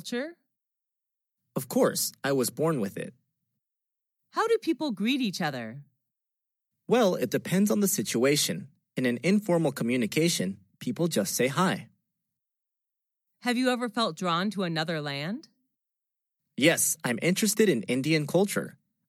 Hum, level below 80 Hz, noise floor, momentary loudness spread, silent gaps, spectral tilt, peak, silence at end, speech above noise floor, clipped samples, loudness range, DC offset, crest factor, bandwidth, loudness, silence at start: none; -84 dBFS; -87 dBFS; 12 LU; none; -4 dB/octave; -10 dBFS; 0.4 s; 60 dB; under 0.1%; 5 LU; under 0.1%; 18 dB; 16.5 kHz; -27 LUFS; 0.05 s